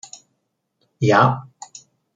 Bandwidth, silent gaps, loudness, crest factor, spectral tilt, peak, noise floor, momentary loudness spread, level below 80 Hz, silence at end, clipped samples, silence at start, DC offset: 7.8 kHz; none; -18 LUFS; 20 dB; -6 dB/octave; -2 dBFS; -73 dBFS; 24 LU; -60 dBFS; 0.75 s; under 0.1%; 1 s; under 0.1%